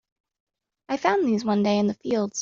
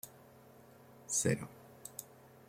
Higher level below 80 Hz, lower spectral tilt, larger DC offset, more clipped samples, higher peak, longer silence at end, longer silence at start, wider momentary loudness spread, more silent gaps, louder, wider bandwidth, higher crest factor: first, -66 dBFS vs -72 dBFS; about the same, -5 dB/octave vs -4 dB/octave; neither; neither; first, -6 dBFS vs -18 dBFS; second, 0 s vs 0.2 s; first, 0.9 s vs 0.05 s; second, 5 LU vs 27 LU; neither; first, -24 LUFS vs -37 LUFS; second, 7.4 kHz vs 16.5 kHz; about the same, 20 dB vs 24 dB